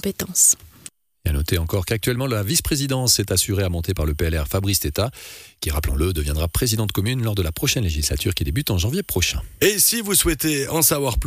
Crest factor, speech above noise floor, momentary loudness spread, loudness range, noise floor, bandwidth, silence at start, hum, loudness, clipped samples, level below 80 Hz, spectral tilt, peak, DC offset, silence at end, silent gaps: 16 dB; 24 dB; 9 LU; 3 LU; -45 dBFS; 15.5 kHz; 0.05 s; none; -20 LUFS; under 0.1%; -30 dBFS; -3.5 dB/octave; -4 dBFS; under 0.1%; 0 s; none